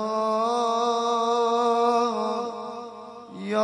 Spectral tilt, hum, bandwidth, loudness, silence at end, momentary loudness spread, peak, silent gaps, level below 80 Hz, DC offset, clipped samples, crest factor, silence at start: -4 dB/octave; none; 10.5 kHz; -24 LUFS; 0 s; 16 LU; -10 dBFS; none; -78 dBFS; under 0.1%; under 0.1%; 14 dB; 0 s